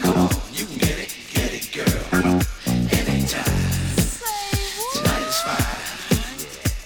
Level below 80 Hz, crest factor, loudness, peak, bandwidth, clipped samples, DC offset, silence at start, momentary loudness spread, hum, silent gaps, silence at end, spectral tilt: -32 dBFS; 18 dB; -22 LUFS; -4 dBFS; over 20 kHz; under 0.1%; under 0.1%; 0 s; 6 LU; none; none; 0 s; -4.5 dB/octave